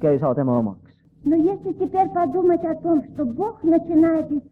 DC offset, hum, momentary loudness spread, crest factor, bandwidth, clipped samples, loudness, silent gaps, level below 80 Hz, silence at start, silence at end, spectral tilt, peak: under 0.1%; none; 7 LU; 12 dB; 3 kHz; under 0.1%; -21 LUFS; none; -56 dBFS; 0 s; 0.1 s; -11 dB/octave; -8 dBFS